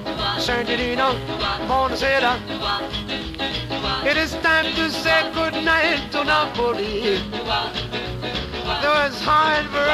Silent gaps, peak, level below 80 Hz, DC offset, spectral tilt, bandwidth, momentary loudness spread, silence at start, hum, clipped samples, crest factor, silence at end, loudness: none; -6 dBFS; -38 dBFS; under 0.1%; -4 dB/octave; 15.5 kHz; 8 LU; 0 s; none; under 0.1%; 16 dB; 0 s; -20 LUFS